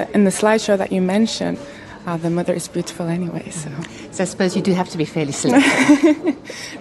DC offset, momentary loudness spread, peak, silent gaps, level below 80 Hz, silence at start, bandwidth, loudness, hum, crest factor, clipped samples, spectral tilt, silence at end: under 0.1%; 16 LU; 0 dBFS; none; -54 dBFS; 0 s; 12.5 kHz; -18 LUFS; none; 18 dB; under 0.1%; -5 dB/octave; 0 s